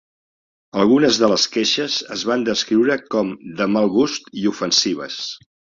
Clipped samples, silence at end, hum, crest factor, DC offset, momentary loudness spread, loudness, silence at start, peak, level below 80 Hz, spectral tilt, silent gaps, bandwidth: under 0.1%; 0.4 s; none; 16 dB; under 0.1%; 11 LU; -18 LUFS; 0.75 s; -2 dBFS; -58 dBFS; -3.5 dB/octave; none; 7.6 kHz